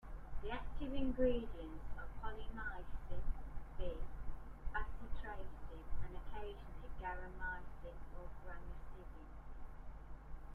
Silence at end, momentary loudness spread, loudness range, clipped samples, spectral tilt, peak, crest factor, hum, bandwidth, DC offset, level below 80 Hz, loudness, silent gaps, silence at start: 0 s; 14 LU; 7 LU; under 0.1%; -7.5 dB/octave; -22 dBFS; 18 dB; none; 3.9 kHz; under 0.1%; -46 dBFS; -48 LUFS; none; 0.05 s